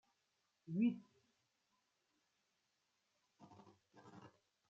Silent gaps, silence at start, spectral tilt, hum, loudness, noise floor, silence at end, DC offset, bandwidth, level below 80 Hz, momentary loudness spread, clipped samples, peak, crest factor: none; 0.7 s; -8 dB/octave; none; -41 LUFS; -85 dBFS; 0.45 s; under 0.1%; 7 kHz; under -90 dBFS; 25 LU; under 0.1%; -28 dBFS; 22 dB